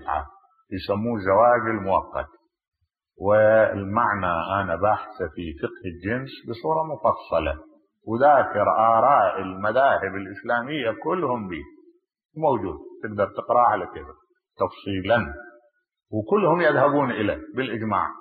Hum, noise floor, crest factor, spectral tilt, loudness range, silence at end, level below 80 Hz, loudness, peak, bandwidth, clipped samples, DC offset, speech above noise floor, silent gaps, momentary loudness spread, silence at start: none; -59 dBFS; 18 dB; -10.5 dB/octave; 5 LU; 0 s; -50 dBFS; -23 LUFS; -6 dBFS; 4.9 kHz; under 0.1%; under 0.1%; 36 dB; none; 15 LU; 0 s